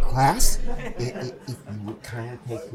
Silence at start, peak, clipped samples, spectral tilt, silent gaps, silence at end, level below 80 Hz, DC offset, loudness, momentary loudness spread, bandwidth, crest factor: 0 s; -4 dBFS; under 0.1%; -4 dB/octave; none; 0 s; -28 dBFS; under 0.1%; -28 LUFS; 15 LU; 17 kHz; 18 dB